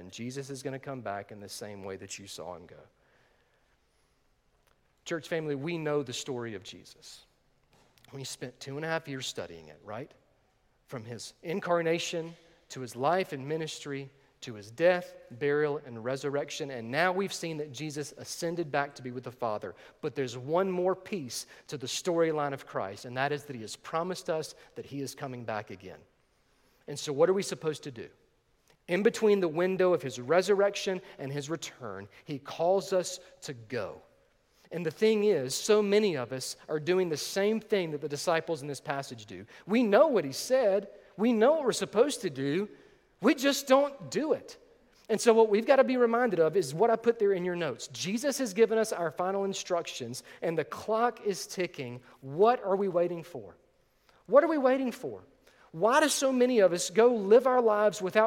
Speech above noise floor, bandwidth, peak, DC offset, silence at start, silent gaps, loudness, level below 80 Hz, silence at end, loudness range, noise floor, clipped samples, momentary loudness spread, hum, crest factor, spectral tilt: 41 dB; 17 kHz; -8 dBFS; under 0.1%; 0 s; none; -29 LUFS; -74 dBFS; 0 s; 13 LU; -70 dBFS; under 0.1%; 18 LU; none; 22 dB; -4.5 dB/octave